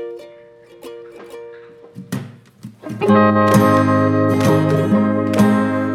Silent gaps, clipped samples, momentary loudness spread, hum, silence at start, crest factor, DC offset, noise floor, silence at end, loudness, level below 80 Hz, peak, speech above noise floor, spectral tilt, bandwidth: none; under 0.1%; 23 LU; none; 0 s; 16 dB; under 0.1%; -43 dBFS; 0 s; -14 LUFS; -56 dBFS; -2 dBFS; 31 dB; -7 dB/octave; 15.5 kHz